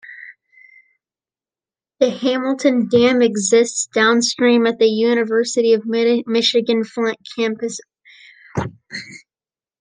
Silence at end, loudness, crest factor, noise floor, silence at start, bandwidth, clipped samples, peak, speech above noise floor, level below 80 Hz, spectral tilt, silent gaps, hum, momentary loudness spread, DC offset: 0.65 s; -17 LUFS; 16 dB; under -90 dBFS; 0.05 s; 10 kHz; under 0.1%; -2 dBFS; over 73 dB; -62 dBFS; -3.5 dB/octave; none; none; 14 LU; under 0.1%